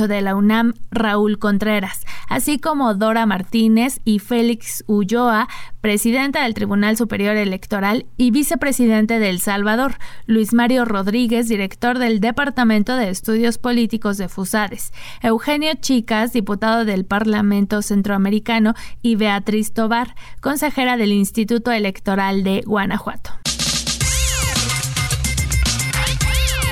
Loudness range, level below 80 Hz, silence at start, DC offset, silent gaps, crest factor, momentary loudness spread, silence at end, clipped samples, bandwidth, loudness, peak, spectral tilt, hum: 2 LU; -32 dBFS; 0 s; under 0.1%; none; 10 dB; 5 LU; 0 s; under 0.1%; 18 kHz; -18 LUFS; -8 dBFS; -4.5 dB/octave; none